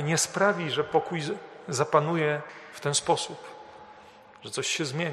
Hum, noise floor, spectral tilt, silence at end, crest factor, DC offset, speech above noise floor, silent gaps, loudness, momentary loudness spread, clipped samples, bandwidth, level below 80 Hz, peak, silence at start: none; -51 dBFS; -3.5 dB/octave; 0 s; 22 dB; under 0.1%; 24 dB; none; -27 LUFS; 18 LU; under 0.1%; 13 kHz; -68 dBFS; -6 dBFS; 0 s